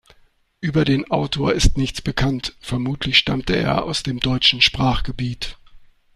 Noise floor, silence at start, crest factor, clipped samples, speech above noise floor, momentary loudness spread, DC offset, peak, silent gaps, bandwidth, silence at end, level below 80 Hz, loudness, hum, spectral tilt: -56 dBFS; 0.6 s; 20 dB; under 0.1%; 37 dB; 11 LU; under 0.1%; 0 dBFS; none; 13.5 kHz; 0.3 s; -30 dBFS; -19 LUFS; none; -4.5 dB/octave